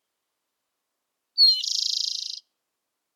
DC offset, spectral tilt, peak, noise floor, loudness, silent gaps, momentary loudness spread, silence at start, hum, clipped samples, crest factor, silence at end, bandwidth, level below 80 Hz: under 0.1%; 8.5 dB/octave; -10 dBFS; -81 dBFS; -20 LUFS; none; 17 LU; 1.35 s; none; under 0.1%; 18 dB; 0.75 s; 18 kHz; under -90 dBFS